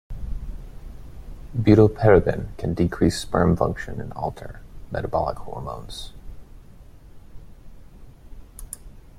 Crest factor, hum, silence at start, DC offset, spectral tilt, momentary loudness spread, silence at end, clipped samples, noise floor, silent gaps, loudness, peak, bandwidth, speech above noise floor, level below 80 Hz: 22 dB; none; 0.1 s; under 0.1%; -7 dB/octave; 27 LU; 0 s; under 0.1%; -45 dBFS; none; -22 LUFS; -2 dBFS; 14.5 kHz; 24 dB; -38 dBFS